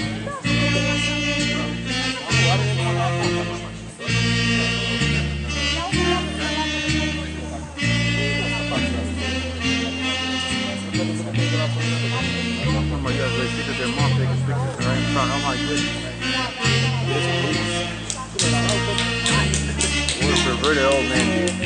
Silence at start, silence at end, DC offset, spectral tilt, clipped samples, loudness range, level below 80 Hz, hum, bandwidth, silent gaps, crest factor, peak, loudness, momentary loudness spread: 0 s; 0 s; under 0.1%; -4 dB/octave; under 0.1%; 2 LU; -36 dBFS; none; 10.5 kHz; none; 18 dB; -4 dBFS; -21 LUFS; 6 LU